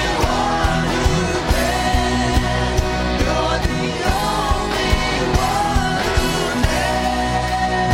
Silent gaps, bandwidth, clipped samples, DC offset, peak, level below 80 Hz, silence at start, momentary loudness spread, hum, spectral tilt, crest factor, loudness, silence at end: none; 16.5 kHz; under 0.1%; under 0.1%; -2 dBFS; -24 dBFS; 0 s; 2 LU; none; -4.5 dB/octave; 16 dB; -18 LUFS; 0 s